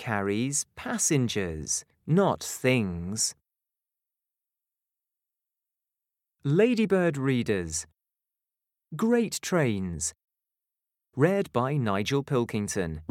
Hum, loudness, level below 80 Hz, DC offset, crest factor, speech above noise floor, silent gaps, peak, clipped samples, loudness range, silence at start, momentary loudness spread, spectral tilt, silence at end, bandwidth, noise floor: none; -27 LUFS; -60 dBFS; under 0.1%; 20 dB; 63 dB; none; -8 dBFS; under 0.1%; 5 LU; 0 s; 8 LU; -4.5 dB/octave; 0.05 s; 16.5 kHz; -89 dBFS